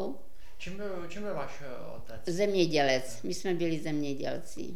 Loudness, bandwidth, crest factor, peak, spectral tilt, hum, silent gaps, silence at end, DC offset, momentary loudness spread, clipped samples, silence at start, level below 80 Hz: -32 LUFS; 17 kHz; 22 dB; -10 dBFS; -5 dB/octave; none; none; 0 s; 2%; 17 LU; under 0.1%; 0 s; -56 dBFS